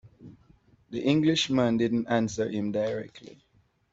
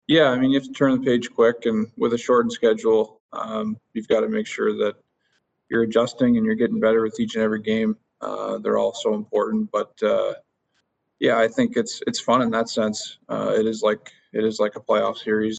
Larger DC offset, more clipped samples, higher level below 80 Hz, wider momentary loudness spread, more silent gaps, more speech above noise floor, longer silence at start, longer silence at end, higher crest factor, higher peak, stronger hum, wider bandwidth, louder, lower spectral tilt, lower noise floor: neither; neither; about the same, -62 dBFS vs -62 dBFS; about the same, 11 LU vs 9 LU; second, none vs 3.20-3.29 s; second, 34 dB vs 50 dB; about the same, 0.05 s vs 0.1 s; first, 0.65 s vs 0 s; about the same, 18 dB vs 18 dB; second, -10 dBFS vs -4 dBFS; neither; second, 8 kHz vs 9 kHz; second, -27 LUFS vs -22 LUFS; about the same, -5.5 dB/octave vs -5 dB/octave; second, -60 dBFS vs -72 dBFS